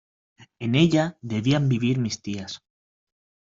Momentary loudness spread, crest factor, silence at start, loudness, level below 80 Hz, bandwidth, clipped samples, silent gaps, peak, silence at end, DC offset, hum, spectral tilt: 14 LU; 20 dB; 0.4 s; -24 LUFS; -58 dBFS; 7.6 kHz; under 0.1%; none; -6 dBFS; 1 s; under 0.1%; none; -6 dB/octave